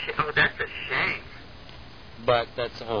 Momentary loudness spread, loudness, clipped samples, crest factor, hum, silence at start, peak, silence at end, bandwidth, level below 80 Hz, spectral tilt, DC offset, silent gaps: 23 LU; -26 LUFS; under 0.1%; 20 dB; none; 0 s; -8 dBFS; 0 s; 5.4 kHz; -50 dBFS; -5.5 dB/octave; 0.4%; none